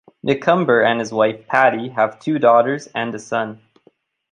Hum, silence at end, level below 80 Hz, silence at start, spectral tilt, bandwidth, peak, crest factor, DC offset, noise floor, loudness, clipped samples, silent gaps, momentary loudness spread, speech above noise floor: none; 0.75 s; -64 dBFS; 0.25 s; -5.5 dB/octave; 10 kHz; -2 dBFS; 16 dB; under 0.1%; -57 dBFS; -17 LUFS; under 0.1%; none; 10 LU; 40 dB